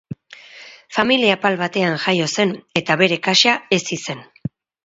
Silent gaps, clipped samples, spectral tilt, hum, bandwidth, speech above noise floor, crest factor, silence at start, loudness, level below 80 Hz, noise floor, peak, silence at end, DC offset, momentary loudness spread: none; under 0.1%; -3.5 dB/octave; none; 8 kHz; 24 dB; 20 dB; 0.1 s; -17 LUFS; -60 dBFS; -42 dBFS; 0 dBFS; 0.4 s; under 0.1%; 19 LU